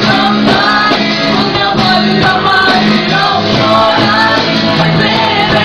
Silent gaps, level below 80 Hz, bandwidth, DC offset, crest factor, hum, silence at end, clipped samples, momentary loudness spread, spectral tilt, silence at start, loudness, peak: none; -36 dBFS; 11.5 kHz; 0.6%; 10 dB; none; 0 s; under 0.1%; 2 LU; -5 dB/octave; 0 s; -9 LUFS; 0 dBFS